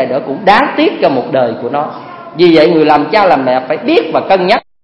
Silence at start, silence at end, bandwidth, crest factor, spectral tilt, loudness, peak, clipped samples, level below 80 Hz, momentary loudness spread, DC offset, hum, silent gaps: 0 s; 0.25 s; 8.2 kHz; 10 dB; -7 dB/octave; -10 LUFS; 0 dBFS; 0.4%; -48 dBFS; 9 LU; under 0.1%; none; none